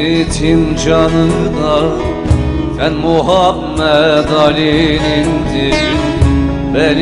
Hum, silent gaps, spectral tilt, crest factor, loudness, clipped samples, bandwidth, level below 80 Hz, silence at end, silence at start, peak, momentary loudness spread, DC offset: none; none; -6 dB/octave; 12 dB; -12 LUFS; under 0.1%; 11 kHz; -22 dBFS; 0 s; 0 s; 0 dBFS; 4 LU; under 0.1%